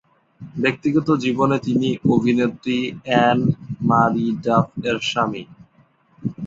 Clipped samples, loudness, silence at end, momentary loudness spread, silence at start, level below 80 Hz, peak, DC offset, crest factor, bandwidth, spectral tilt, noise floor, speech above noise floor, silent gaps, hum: under 0.1%; -19 LUFS; 0 s; 7 LU; 0.4 s; -54 dBFS; -2 dBFS; under 0.1%; 18 dB; 7.8 kHz; -6.5 dB/octave; -57 dBFS; 38 dB; none; none